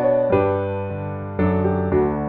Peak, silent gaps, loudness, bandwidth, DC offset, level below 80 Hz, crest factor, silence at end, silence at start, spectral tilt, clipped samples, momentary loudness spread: -6 dBFS; none; -21 LUFS; 4.2 kHz; under 0.1%; -40 dBFS; 14 dB; 0 s; 0 s; -12 dB/octave; under 0.1%; 10 LU